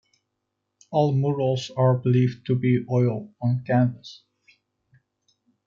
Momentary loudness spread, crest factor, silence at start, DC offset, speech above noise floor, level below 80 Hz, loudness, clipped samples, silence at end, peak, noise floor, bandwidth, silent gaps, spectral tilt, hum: 6 LU; 16 dB; 0.9 s; under 0.1%; 57 dB; -66 dBFS; -23 LUFS; under 0.1%; 1.5 s; -10 dBFS; -80 dBFS; 7.2 kHz; none; -8.5 dB/octave; none